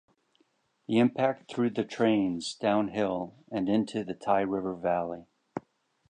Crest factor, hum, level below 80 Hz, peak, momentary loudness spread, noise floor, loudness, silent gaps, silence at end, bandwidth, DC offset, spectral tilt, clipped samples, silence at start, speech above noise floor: 18 dB; none; -66 dBFS; -12 dBFS; 16 LU; -71 dBFS; -29 LUFS; none; 0.55 s; 9.8 kHz; under 0.1%; -6 dB/octave; under 0.1%; 0.9 s; 43 dB